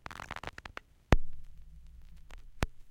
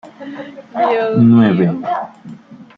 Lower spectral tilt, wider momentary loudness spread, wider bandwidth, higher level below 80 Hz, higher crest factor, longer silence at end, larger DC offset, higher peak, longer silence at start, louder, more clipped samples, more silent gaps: second, -6 dB/octave vs -10 dB/octave; first, 25 LU vs 21 LU; first, 11 kHz vs 4.8 kHz; first, -38 dBFS vs -56 dBFS; first, 28 dB vs 14 dB; second, 0 s vs 0.15 s; neither; second, -6 dBFS vs -2 dBFS; about the same, 0.1 s vs 0.05 s; second, -37 LUFS vs -13 LUFS; neither; neither